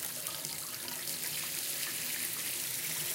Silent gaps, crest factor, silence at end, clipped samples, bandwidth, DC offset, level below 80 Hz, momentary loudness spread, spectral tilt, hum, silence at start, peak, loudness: none; 22 dB; 0 s; under 0.1%; 17 kHz; under 0.1%; -76 dBFS; 3 LU; 0 dB/octave; none; 0 s; -14 dBFS; -34 LUFS